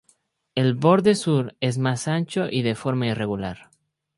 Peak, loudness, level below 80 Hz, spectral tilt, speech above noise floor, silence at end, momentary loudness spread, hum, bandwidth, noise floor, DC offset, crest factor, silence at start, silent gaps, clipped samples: -4 dBFS; -23 LUFS; -56 dBFS; -6 dB/octave; 43 dB; 0.6 s; 11 LU; none; 11.5 kHz; -64 dBFS; under 0.1%; 20 dB; 0.55 s; none; under 0.1%